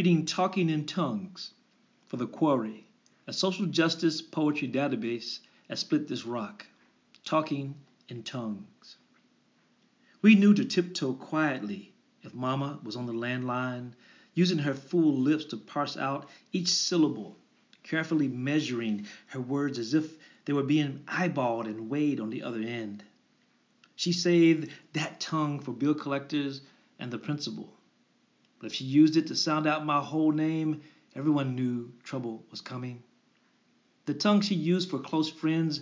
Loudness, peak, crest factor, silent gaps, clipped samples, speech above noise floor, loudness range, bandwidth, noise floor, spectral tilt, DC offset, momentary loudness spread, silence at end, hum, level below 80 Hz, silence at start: -29 LUFS; -8 dBFS; 22 dB; none; under 0.1%; 40 dB; 7 LU; 7.6 kHz; -68 dBFS; -5.5 dB/octave; under 0.1%; 16 LU; 0 s; none; -84 dBFS; 0 s